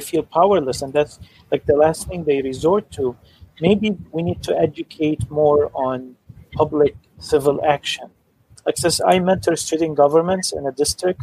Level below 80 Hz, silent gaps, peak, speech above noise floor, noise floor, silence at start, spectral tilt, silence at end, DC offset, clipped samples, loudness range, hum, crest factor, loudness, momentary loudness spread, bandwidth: -46 dBFS; none; -2 dBFS; 33 dB; -52 dBFS; 0 s; -5 dB/octave; 0 s; under 0.1%; under 0.1%; 2 LU; none; 18 dB; -19 LUFS; 9 LU; 15.5 kHz